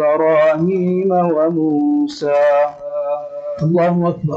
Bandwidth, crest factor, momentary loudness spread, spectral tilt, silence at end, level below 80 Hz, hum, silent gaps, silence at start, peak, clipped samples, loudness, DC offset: 7.6 kHz; 10 dB; 8 LU; -8.5 dB/octave; 0 s; -58 dBFS; none; none; 0 s; -4 dBFS; under 0.1%; -16 LUFS; under 0.1%